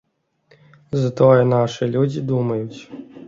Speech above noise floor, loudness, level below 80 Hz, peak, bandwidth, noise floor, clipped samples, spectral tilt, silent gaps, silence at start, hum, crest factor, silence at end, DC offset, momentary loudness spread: 42 dB; -18 LUFS; -56 dBFS; -2 dBFS; 7.6 kHz; -60 dBFS; under 0.1%; -8 dB/octave; none; 0.9 s; none; 18 dB; 0 s; under 0.1%; 17 LU